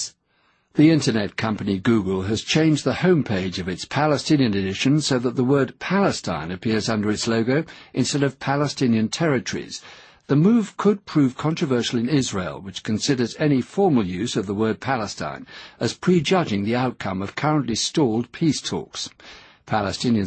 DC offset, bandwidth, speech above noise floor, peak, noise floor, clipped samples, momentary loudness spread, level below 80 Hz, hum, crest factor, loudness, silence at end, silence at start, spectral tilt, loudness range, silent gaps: under 0.1%; 8.8 kHz; 43 dB; -4 dBFS; -64 dBFS; under 0.1%; 9 LU; -54 dBFS; none; 16 dB; -22 LUFS; 0 s; 0 s; -5.5 dB/octave; 3 LU; none